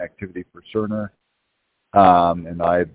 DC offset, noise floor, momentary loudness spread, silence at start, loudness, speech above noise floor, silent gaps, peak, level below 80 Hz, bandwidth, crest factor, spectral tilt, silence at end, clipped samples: under 0.1%; -72 dBFS; 20 LU; 0 s; -18 LUFS; 54 dB; none; 0 dBFS; -46 dBFS; 4 kHz; 20 dB; -10.5 dB/octave; 0.05 s; under 0.1%